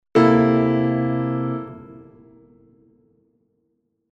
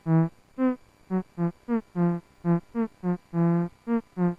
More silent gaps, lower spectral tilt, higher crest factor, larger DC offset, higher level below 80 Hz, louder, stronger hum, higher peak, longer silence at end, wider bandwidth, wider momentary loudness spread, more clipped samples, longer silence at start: neither; second, -9 dB/octave vs -11 dB/octave; about the same, 18 dB vs 14 dB; neither; first, -56 dBFS vs -62 dBFS; first, -19 LUFS vs -28 LUFS; neither; first, -4 dBFS vs -14 dBFS; first, 2.15 s vs 0.05 s; first, 7.6 kHz vs 3.2 kHz; first, 18 LU vs 7 LU; neither; about the same, 0.15 s vs 0.05 s